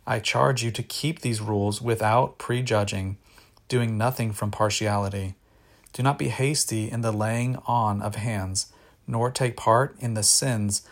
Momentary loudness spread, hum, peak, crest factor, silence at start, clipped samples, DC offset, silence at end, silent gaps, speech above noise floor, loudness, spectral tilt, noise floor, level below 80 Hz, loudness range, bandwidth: 7 LU; none; -6 dBFS; 20 dB; 0.05 s; under 0.1%; under 0.1%; 0.1 s; none; 32 dB; -25 LUFS; -4.5 dB/octave; -56 dBFS; -58 dBFS; 3 LU; 16.5 kHz